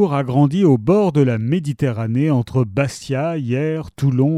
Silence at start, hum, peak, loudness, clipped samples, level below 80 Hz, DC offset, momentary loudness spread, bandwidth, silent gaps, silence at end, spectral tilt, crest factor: 0 s; none; -2 dBFS; -18 LUFS; under 0.1%; -48 dBFS; under 0.1%; 7 LU; 11.5 kHz; none; 0 s; -8 dB/octave; 14 dB